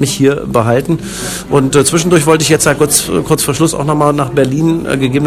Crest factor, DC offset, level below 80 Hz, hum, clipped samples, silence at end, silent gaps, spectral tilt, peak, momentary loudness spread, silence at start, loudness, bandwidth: 12 dB; under 0.1%; -36 dBFS; none; 0.9%; 0 s; none; -4.5 dB/octave; 0 dBFS; 5 LU; 0 s; -11 LUFS; over 20 kHz